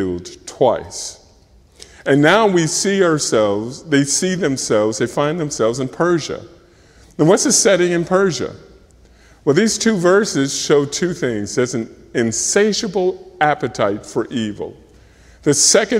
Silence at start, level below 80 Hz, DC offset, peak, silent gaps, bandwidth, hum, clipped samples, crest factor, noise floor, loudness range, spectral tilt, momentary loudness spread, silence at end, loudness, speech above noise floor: 0 s; -50 dBFS; under 0.1%; 0 dBFS; none; 16 kHz; none; under 0.1%; 18 dB; -49 dBFS; 3 LU; -3.5 dB/octave; 13 LU; 0 s; -16 LUFS; 33 dB